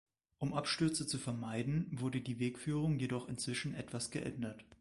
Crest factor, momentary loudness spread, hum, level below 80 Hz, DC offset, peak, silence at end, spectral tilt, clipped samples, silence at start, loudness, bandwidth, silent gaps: 18 dB; 7 LU; none; -64 dBFS; under 0.1%; -22 dBFS; 0.05 s; -5 dB/octave; under 0.1%; 0.4 s; -39 LUFS; 11.5 kHz; none